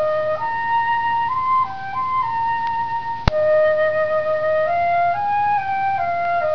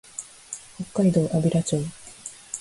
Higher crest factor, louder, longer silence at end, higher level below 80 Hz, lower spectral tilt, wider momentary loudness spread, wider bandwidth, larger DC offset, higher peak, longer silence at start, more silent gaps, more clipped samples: about the same, 20 dB vs 16 dB; first, -20 LUFS vs -24 LUFS; about the same, 0 s vs 0 s; first, -40 dBFS vs -58 dBFS; about the same, -6.5 dB/octave vs -6.5 dB/octave; second, 5 LU vs 17 LU; second, 5.4 kHz vs 11.5 kHz; first, 2% vs under 0.1%; first, 0 dBFS vs -10 dBFS; second, 0 s vs 0.2 s; neither; neither